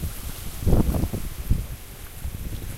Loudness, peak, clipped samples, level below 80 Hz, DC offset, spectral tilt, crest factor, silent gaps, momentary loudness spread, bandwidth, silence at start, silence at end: -28 LUFS; -6 dBFS; under 0.1%; -28 dBFS; under 0.1%; -6.5 dB/octave; 20 dB; none; 15 LU; 16 kHz; 0 s; 0 s